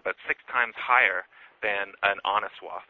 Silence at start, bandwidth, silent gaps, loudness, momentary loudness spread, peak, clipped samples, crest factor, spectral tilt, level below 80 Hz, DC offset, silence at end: 0.05 s; 7 kHz; none; -25 LUFS; 11 LU; -4 dBFS; under 0.1%; 22 dB; -4 dB/octave; -68 dBFS; under 0.1%; 0.05 s